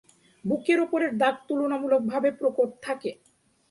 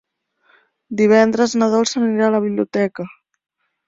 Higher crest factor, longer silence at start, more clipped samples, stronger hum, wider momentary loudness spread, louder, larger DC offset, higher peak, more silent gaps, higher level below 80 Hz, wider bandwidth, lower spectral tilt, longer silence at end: about the same, 18 dB vs 16 dB; second, 0.45 s vs 0.9 s; neither; neither; second, 9 LU vs 13 LU; second, -26 LUFS vs -16 LUFS; neither; second, -10 dBFS vs -2 dBFS; neither; second, -72 dBFS vs -62 dBFS; first, 11.5 kHz vs 7.8 kHz; about the same, -6 dB/octave vs -5 dB/octave; second, 0.55 s vs 0.8 s